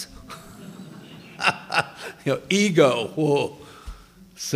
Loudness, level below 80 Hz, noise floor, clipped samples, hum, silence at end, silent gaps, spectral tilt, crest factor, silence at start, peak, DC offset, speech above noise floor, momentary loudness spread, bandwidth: -22 LUFS; -50 dBFS; -45 dBFS; under 0.1%; none; 0 s; none; -4.5 dB/octave; 22 dB; 0 s; -2 dBFS; under 0.1%; 25 dB; 24 LU; 16 kHz